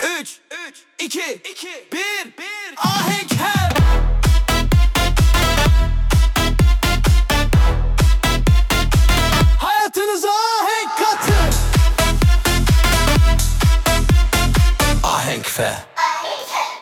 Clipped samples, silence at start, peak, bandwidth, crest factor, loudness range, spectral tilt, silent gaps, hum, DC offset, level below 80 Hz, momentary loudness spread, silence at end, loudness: under 0.1%; 0 s; -4 dBFS; 18 kHz; 12 dB; 4 LU; -4.5 dB/octave; none; none; under 0.1%; -18 dBFS; 10 LU; 0 s; -17 LUFS